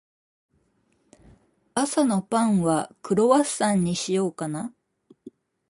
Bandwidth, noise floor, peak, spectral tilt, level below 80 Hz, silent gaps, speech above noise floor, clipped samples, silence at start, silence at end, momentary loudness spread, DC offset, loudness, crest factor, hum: 11.5 kHz; -68 dBFS; -6 dBFS; -5 dB/octave; -62 dBFS; none; 45 dB; under 0.1%; 1.75 s; 0.4 s; 11 LU; under 0.1%; -23 LUFS; 20 dB; none